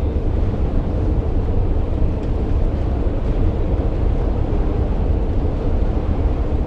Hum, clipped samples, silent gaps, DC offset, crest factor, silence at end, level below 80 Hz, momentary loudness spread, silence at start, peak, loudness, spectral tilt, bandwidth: none; under 0.1%; none; under 0.1%; 12 dB; 0 s; -20 dBFS; 1 LU; 0 s; -6 dBFS; -21 LUFS; -10 dB/octave; 5 kHz